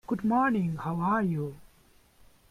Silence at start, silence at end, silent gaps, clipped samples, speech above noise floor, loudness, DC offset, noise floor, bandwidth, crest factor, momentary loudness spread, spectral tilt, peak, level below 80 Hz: 0.1 s; 0.9 s; none; under 0.1%; 33 dB; -28 LUFS; under 0.1%; -61 dBFS; 14.5 kHz; 14 dB; 8 LU; -9 dB/octave; -14 dBFS; -60 dBFS